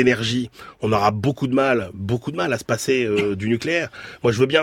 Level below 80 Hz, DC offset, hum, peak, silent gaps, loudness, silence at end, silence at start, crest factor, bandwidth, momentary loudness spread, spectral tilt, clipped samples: -52 dBFS; under 0.1%; none; -4 dBFS; none; -21 LUFS; 0 s; 0 s; 18 dB; 16.5 kHz; 7 LU; -5.5 dB/octave; under 0.1%